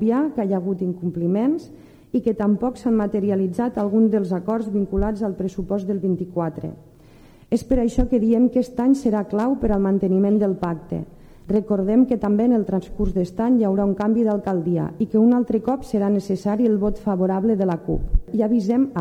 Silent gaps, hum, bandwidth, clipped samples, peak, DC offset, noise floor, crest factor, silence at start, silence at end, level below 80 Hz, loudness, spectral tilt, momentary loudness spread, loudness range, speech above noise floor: none; none; 10 kHz; under 0.1%; -6 dBFS; under 0.1%; -48 dBFS; 16 dB; 0 s; 0 s; -34 dBFS; -21 LUFS; -9 dB/octave; 7 LU; 3 LU; 28 dB